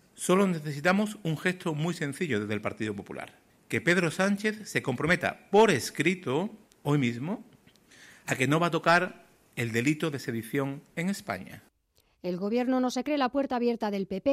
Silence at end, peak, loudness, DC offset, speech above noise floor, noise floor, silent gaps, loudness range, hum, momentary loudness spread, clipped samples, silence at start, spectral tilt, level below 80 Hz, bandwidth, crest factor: 0 s; -10 dBFS; -28 LUFS; under 0.1%; 41 dB; -69 dBFS; none; 5 LU; none; 12 LU; under 0.1%; 0.2 s; -5.5 dB/octave; -66 dBFS; 16 kHz; 18 dB